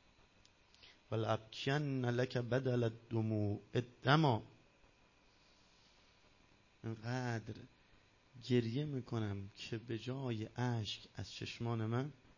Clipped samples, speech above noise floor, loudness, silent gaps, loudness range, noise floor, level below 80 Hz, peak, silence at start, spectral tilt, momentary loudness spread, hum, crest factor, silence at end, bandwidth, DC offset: under 0.1%; 31 dB; -39 LUFS; none; 11 LU; -69 dBFS; -68 dBFS; -14 dBFS; 0.85 s; -6.5 dB/octave; 11 LU; none; 26 dB; 0.25 s; 7.4 kHz; under 0.1%